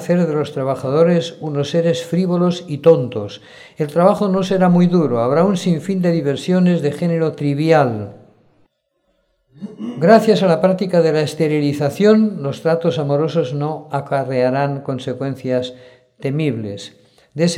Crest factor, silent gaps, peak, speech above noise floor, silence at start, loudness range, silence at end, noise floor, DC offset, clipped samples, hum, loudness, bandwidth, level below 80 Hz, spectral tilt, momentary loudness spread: 16 dB; none; 0 dBFS; 50 dB; 0 s; 6 LU; 0 s; -67 dBFS; under 0.1%; under 0.1%; none; -17 LUFS; 12 kHz; -62 dBFS; -7 dB/octave; 12 LU